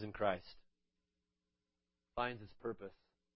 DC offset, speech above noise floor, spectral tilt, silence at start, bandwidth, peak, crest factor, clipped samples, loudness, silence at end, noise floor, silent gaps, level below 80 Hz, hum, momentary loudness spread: under 0.1%; 48 dB; -3.5 dB/octave; 0 s; 5.6 kHz; -20 dBFS; 26 dB; under 0.1%; -43 LUFS; 0.4 s; -90 dBFS; none; -68 dBFS; none; 15 LU